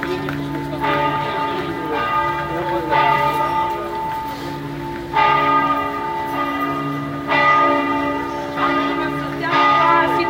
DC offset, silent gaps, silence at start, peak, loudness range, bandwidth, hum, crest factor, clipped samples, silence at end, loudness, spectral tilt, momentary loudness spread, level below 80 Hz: under 0.1%; none; 0 s; -2 dBFS; 3 LU; 16 kHz; none; 16 dB; under 0.1%; 0 s; -19 LUFS; -5.5 dB/octave; 11 LU; -46 dBFS